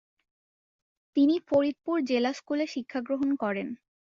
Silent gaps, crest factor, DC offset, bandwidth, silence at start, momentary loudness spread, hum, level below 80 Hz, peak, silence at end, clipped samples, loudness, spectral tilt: none; 16 dB; under 0.1%; 7.4 kHz; 1.15 s; 10 LU; none; -70 dBFS; -12 dBFS; 0.4 s; under 0.1%; -28 LUFS; -5.5 dB/octave